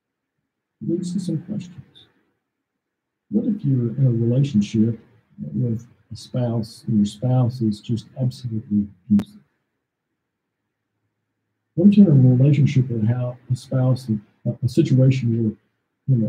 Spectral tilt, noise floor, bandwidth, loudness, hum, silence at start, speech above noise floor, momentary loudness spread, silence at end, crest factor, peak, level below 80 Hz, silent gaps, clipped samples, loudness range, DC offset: -9 dB/octave; -80 dBFS; 9.8 kHz; -20 LUFS; none; 0.8 s; 61 dB; 15 LU; 0 s; 18 dB; -2 dBFS; -60 dBFS; none; under 0.1%; 10 LU; under 0.1%